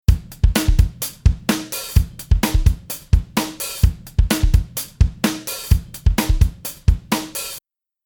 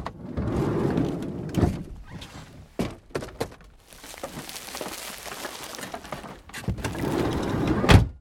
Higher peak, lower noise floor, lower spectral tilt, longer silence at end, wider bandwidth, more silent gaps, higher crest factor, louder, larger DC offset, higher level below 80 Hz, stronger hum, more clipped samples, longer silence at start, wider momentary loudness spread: about the same, 0 dBFS vs -2 dBFS; second, -44 dBFS vs -49 dBFS; about the same, -5 dB/octave vs -6 dB/octave; first, 0.45 s vs 0 s; first, 19.5 kHz vs 17.5 kHz; neither; second, 18 dB vs 26 dB; first, -20 LUFS vs -28 LUFS; neither; first, -20 dBFS vs -36 dBFS; neither; neither; about the same, 0.1 s vs 0 s; second, 7 LU vs 15 LU